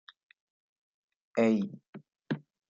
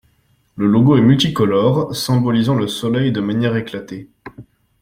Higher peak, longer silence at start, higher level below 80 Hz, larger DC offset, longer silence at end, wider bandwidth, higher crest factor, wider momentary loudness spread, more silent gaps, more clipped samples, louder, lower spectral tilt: second, -16 dBFS vs -2 dBFS; first, 1.35 s vs 0.55 s; second, -80 dBFS vs -50 dBFS; neither; about the same, 0.3 s vs 0.4 s; second, 7.6 kHz vs 16 kHz; first, 20 dB vs 14 dB; first, 25 LU vs 13 LU; first, 1.89-1.93 s vs none; neither; second, -31 LUFS vs -16 LUFS; about the same, -7.5 dB/octave vs -6.5 dB/octave